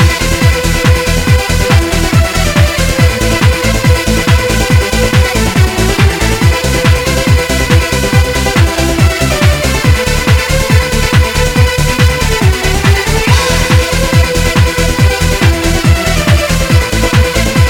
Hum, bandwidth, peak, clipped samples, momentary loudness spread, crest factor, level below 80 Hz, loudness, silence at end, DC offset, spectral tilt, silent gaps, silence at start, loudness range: none; 19 kHz; 0 dBFS; 0.3%; 1 LU; 8 dB; -16 dBFS; -10 LUFS; 0 s; under 0.1%; -4.5 dB/octave; none; 0 s; 0 LU